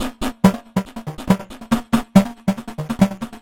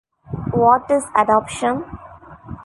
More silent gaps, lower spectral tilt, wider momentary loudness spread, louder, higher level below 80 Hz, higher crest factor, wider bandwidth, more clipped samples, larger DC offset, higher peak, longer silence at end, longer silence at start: neither; about the same, -6.5 dB/octave vs -6 dB/octave; second, 12 LU vs 20 LU; about the same, -20 LUFS vs -18 LUFS; first, -40 dBFS vs -46 dBFS; about the same, 20 dB vs 18 dB; first, 16.5 kHz vs 11.5 kHz; neither; neither; about the same, 0 dBFS vs -2 dBFS; about the same, 0.05 s vs 0 s; second, 0 s vs 0.3 s